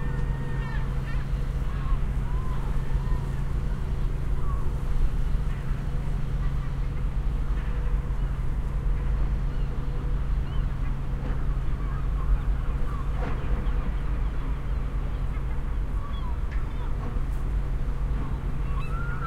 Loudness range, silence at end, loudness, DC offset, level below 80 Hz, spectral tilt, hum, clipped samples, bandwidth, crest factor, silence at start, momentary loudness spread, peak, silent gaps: 1 LU; 0 s; -31 LUFS; under 0.1%; -26 dBFS; -8 dB/octave; none; under 0.1%; 6.4 kHz; 14 dB; 0 s; 2 LU; -12 dBFS; none